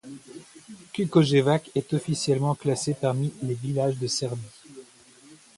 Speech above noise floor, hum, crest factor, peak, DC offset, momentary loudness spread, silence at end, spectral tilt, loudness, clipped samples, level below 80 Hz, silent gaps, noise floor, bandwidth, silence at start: 28 dB; none; 20 dB; -6 dBFS; under 0.1%; 23 LU; 0.2 s; -5.5 dB/octave; -25 LUFS; under 0.1%; -64 dBFS; none; -53 dBFS; 11.5 kHz; 0.05 s